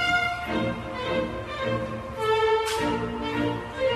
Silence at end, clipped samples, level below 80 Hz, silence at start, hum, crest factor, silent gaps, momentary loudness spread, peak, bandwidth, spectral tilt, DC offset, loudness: 0 s; under 0.1%; -46 dBFS; 0 s; none; 14 dB; none; 7 LU; -12 dBFS; 14 kHz; -5 dB/octave; under 0.1%; -27 LUFS